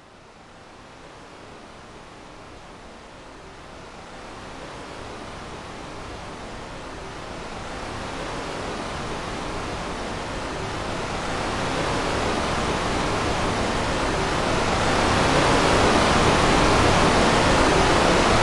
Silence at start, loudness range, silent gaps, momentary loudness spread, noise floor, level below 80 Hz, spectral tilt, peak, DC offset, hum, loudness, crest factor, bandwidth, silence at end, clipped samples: 0.15 s; 23 LU; none; 24 LU; -47 dBFS; -36 dBFS; -4 dB/octave; -6 dBFS; under 0.1%; none; -22 LUFS; 18 dB; 11.5 kHz; 0 s; under 0.1%